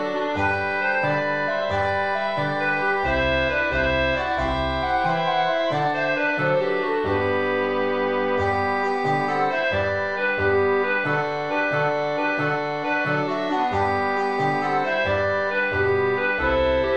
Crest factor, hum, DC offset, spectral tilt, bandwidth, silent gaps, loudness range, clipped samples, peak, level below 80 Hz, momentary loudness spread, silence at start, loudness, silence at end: 14 dB; none; 0.5%; -6.5 dB/octave; 9 kHz; none; 1 LU; under 0.1%; -10 dBFS; -42 dBFS; 3 LU; 0 s; -22 LUFS; 0 s